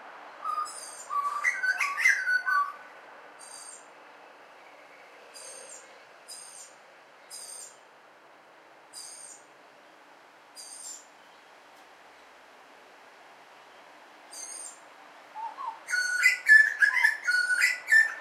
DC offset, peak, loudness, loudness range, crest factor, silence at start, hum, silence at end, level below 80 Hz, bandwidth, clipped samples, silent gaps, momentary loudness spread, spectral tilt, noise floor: under 0.1%; -8 dBFS; -24 LUFS; 24 LU; 22 dB; 0 s; none; 0 s; under -90 dBFS; 16 kHz; under 0.1%; none; 25 LU; 2.5 dB/octave; -55 dBFS